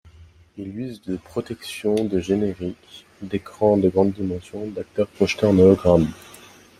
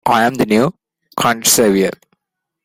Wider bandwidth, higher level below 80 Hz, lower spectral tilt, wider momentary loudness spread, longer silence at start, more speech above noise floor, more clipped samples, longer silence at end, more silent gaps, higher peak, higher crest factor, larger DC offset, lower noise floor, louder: second, 14 kHz vs 16.5 kHz; about the same, -50 dBFS vs -52 dBFS; first, -7 dB/octave vs -3.5 dB/octave; first, 17 LU vs 9 LU; first, 0.2 s vs 0.05 s; second, 28 dB vs 64 dB; neither; about the same, 0.65 s vs 0.75 s; neither; about the same, -2 dBFS vs 0 dBFS; about the same, 20 dB vs 16 dB; neither; second, -49 dBFS vs -77 dBFS; second, -21 LUFS vs -14 LUFS